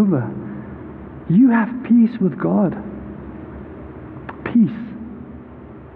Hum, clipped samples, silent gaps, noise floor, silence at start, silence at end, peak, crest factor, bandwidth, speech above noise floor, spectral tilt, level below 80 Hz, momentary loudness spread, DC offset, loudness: none; under 0.1%; none; -38 dBFS; 0 s; 0 s; -6 dBFS; 14 dB; 4.1 kHz; 22 dB; -12.5 dB/octave; -46 dBFS; 21 LU; under 0.1%; -18 LUFS